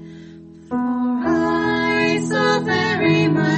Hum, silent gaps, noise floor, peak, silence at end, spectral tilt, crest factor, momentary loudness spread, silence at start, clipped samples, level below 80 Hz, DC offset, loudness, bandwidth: none; none; -40 dBFS; -4 dBFS; 0 s; -6 dB/octave; 14 dB; 7 LU; 0 s; under 0.1%; -52 dBFS; under 0.1%; -18 LUFS; 8.8 kHz